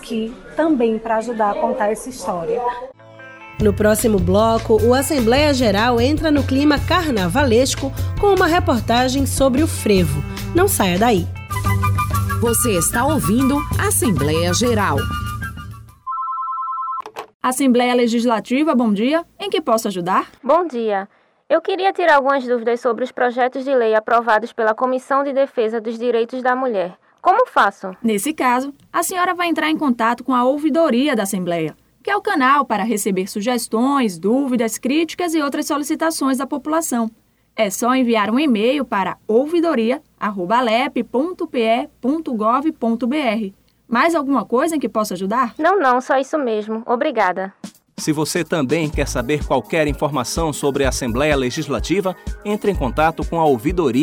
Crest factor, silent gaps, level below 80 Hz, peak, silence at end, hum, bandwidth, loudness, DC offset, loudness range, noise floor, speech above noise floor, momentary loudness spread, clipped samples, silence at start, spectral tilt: 14 dB; 17.34-17.40 s; -36 dBFS; -4 dBFS; 0 s; none; over 20 kHz; -18 LUFS; under 0.1%; 4 LU; -39 dBFS; 21 dB; 8 LU; under 0.1%; 0 s; -5 dB/octave